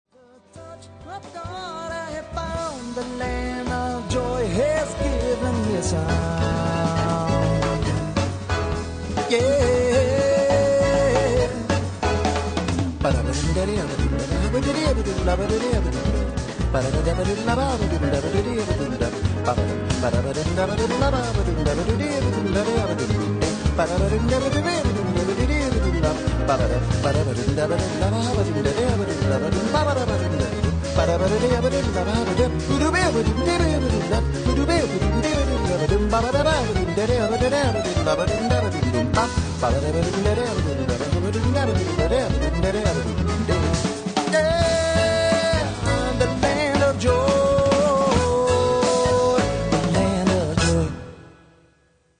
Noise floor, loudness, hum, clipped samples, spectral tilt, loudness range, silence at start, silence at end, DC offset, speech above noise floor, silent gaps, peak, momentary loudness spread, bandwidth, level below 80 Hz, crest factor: -61 dBFS; -22 LUFS; none; under 0.1%; -5.5 dB/octave; 3 LU; 0.55 s; 0.9 s; under 0.1%; 40 dB; none; -6 dBFS; 6 LU; 10 kHz; -32 dBFS; 14 dB